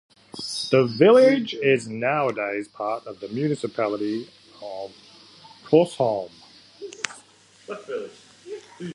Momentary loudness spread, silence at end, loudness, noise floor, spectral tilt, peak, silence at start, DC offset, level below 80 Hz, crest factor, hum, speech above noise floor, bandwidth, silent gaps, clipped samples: 23 LU; 0 s; -22 LUFS; -53 dBFS; -5.5 dB/octave; 0 dBFS; 0.35 s; under 0.1%; -72 dBFS; 24 dB; none; 32 dB; 11.5 kHz; none; under 0.1%